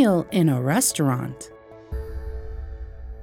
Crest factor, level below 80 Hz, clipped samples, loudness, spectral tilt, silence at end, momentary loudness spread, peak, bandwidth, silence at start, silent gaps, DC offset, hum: 16 dB; -38 dBFS; under 0.1%; -22 LUFS; -5 dB/octave; 0 s; 19 LU; -8 dBFS; 17.5 kHz; 0 s; none; under 0.1%; none